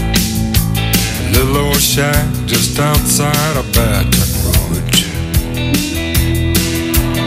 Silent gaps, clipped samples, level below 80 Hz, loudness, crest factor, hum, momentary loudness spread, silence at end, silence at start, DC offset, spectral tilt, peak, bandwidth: none; under 0.1%; -20 dBFS; -13 LUFS; 14 dB; none; 4 LU; 0 s; 0 s; under 0.1%; -4 dB/octave; 0 dBFS; 16.5 kHz